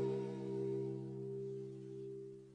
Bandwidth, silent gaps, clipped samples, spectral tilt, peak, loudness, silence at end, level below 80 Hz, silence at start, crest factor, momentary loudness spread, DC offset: 9.6 kHz; none; under 0.1%; -9 dB/octave; -28 dBFS; -44 LUFS; 0 s; -80 dBFS; 0 s; 14 dB; 9 LU; under 0.1%